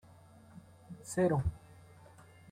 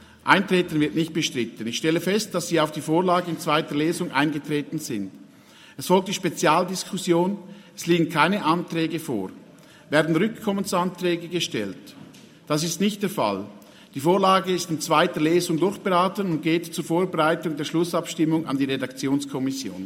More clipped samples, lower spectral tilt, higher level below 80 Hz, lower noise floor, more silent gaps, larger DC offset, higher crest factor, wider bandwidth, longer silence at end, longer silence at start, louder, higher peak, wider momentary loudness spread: neither; first, -7 dB/octave vs -4.5 dB/octave; first, -54 dBFS vs -68 dBFS; first, -58 dBFS vs -50 dBFS; neither; neither; about the same, 20 dB vs 24 dB; about the same, 16 kHz vs 16.5 kHz; first, 0.7 s vs 0 s; first, 0.55 s vs 0.25 s; second, -34 LUFS vs -23 LUFS; second, -18 dBFS vs 0 dBFS; first, 26 LU vs 9 LU